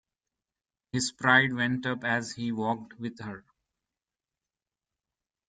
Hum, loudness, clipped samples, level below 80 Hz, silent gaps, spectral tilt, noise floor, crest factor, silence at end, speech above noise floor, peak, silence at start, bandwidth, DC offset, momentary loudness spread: none; -28 LUFS; under 0.1%; -68 dBFS; none; -4 dB/octave; under -90 dBFS; 26 dB; 2.1 s; over 61 dB; -6 dBFS; 0.95 s; 9.6 kHz; under 0.1%; 18 LU